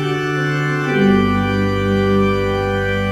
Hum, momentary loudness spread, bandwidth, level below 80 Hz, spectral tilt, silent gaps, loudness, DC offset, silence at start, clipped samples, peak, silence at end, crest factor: none; 4 LU; 15 kHz; -32 dBFS; -7 dB/octave; none; -17 LUFS; under 0.1%; 0 s; under 0.1%; -4 dBFS; 0 s; 14 dB